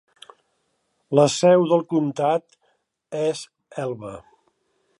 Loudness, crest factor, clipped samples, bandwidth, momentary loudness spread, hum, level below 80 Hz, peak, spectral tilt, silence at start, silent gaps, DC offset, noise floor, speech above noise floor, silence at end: -21 LUFS; 20 dB; under 0.1%; 11.5 kHz; 18 LU; none; -68 dBFS; -4 dBFS; -5.5 dB/octave; 1.1 s; none; under 0.1%; -71 dBFS; 51 dB; 0.8 s